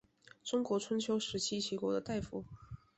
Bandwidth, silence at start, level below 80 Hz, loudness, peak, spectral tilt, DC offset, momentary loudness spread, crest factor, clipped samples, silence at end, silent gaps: 8.2 kHz; 0.45 s; -62 dBFS; -37 LUFS; -22 dBFS; -4 dB/octave; under 0.1%; 12 LU; 16 dB; under 0.1%; 0.2 s; none